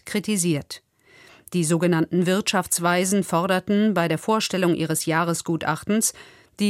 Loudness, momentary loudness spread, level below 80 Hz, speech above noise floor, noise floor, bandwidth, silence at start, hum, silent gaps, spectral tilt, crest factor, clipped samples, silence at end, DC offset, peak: -22 LUFS; 5 LU; -62 dBFS; 30 dB; -52 dBFS; 16 kHz; 0.05 s; none; none; -4.5 dB/octave; 16 dB; under 0.1%; 0 s; under 0.1%; -8 dBFS